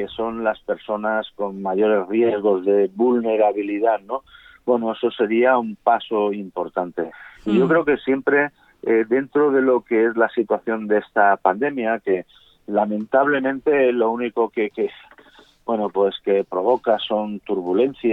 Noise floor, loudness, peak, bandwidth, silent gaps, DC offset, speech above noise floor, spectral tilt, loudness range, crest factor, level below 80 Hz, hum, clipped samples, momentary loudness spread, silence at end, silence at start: -50 dBFS; -20 LUFS; -2 dBFS; 4.1 kHz; none; under 0.1%; 31 dB; -8 dB/octave; 3 LU; 18 dB; -62 dBFS; none; under 0.1%; 9 LU; 0 s; 0 s